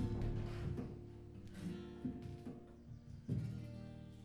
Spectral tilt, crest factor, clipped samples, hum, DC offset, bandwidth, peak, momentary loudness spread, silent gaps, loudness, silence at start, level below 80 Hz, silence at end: -8.5 dB/octave; 16 dB; under 0.1%; none; under 0.1%; 12 kHz; -30 dBFS; 12 LU; none; -48 LUFS; 0 s; -54 dBFS; 0 s